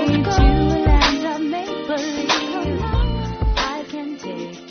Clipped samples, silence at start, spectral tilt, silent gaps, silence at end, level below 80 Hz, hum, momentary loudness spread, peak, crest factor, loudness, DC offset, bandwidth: under 0.1%; 0 s; -4.5 dB/octave; none; 0 s; -22 dBFS; none; 13 LU; -4 dBFS; 16 dB; -20 LUFS; under 0.1%; 6.6 kHz